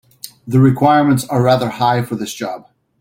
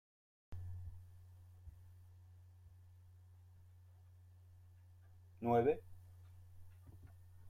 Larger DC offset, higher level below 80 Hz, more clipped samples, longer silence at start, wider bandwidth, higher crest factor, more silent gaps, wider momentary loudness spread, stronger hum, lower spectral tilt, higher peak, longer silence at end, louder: neither; first, -50 dBFS vs -68 dBFS; neither; second, 0.25 s vs 0.5 s; about the same, 16.5 kHz vs 15.5 kHz; second, 14 dB vs 24 dB; neither; second, 17 LU vs 27 LU; neither; second, -6.5 dB/octave vs -9 dB/octave; first, -2 dBFS vs -22 dBFS; first, 0.4 s vs 0 s; first, -15 LUFS vs -40 LUFS